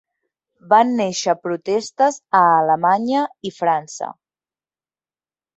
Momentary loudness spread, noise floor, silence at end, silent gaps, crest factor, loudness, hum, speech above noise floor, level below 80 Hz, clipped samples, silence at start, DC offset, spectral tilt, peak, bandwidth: 10 LU; under -90 dBFS; 1.45 s; none; 18 dB; -18 LUFS; none; over 72 dB; -70 dBFS; under 0.1%; 0.65 s; under 0.1%; -4.5 dB/octave; -2 dBFS; 8.2 kHz